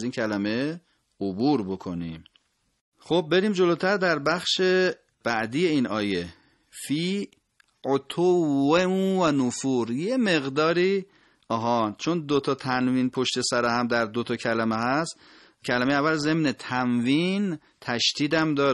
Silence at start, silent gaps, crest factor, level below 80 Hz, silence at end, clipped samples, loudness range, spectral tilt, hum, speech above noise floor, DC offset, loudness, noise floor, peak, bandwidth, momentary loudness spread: 0 s; 2.81-2.92 s; 16 dB; -62 dBFS; 0 s; under 0.1%; 3 LU; -5 dB/octave; none; 42 dB; under 0.1%; -25 LUFS; -67 dBFS; -8 dBFS; 12 kHz; 10 LU